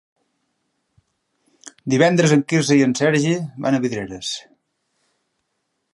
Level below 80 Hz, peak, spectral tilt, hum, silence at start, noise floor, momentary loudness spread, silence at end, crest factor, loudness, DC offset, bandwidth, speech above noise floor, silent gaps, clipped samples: -60 dBFS; -2 dBFS; -5.5 dB/octave; none; 1.65 s; -74 dBFS; 12 LU; 1.55 s; 20 dB; -18 LUFS; under 0.1%; 11.5 kHz; 56 dB; none; under 0.1%